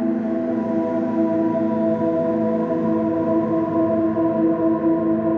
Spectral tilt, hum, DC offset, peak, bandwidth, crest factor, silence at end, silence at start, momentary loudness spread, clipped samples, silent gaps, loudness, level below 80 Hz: -10.5 dB/octave; none; under 0.1%; -8 dBFS; 3.8 kHz; 10 dB; 0 s; 0 s; 3 LU; under 0.1%; none; -20 LUFS; -56 dBFS